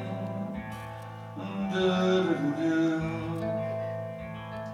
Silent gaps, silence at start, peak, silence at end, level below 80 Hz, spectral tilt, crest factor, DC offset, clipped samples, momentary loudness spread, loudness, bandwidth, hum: none; 0 s; -14 dBFS; 0 s; -56 dBFS; -7 dB/octave; 16 dB; under 0.1%; under 0.1%; 14 LU; -30 LUFS; 12.5 kHz; none